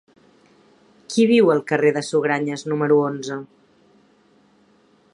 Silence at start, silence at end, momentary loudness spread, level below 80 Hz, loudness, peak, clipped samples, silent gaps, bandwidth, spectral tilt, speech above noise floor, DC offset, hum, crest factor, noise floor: 1.1 s; 1.7 s; 12 LU; -72 dBFS; -19 LUFS; -2 dBFS; under 0.1%; none; 11 kHz; -5.5 dB/octave; 39 dB; under 0.1%; none; 18 dB; -57 dBFS